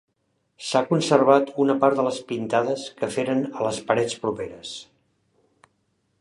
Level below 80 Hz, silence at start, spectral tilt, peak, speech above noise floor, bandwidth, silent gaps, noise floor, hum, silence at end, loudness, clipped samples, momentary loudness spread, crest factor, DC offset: -64 dBFS; 0.6 s; -5 dB/octave; -2 dBFS; 50 dB; 11.5 kHz; none; -72 dBFS; none; 1.35 s; -23 LUFS; under 0.1%; 14 LU; 22 dB; under 0.1%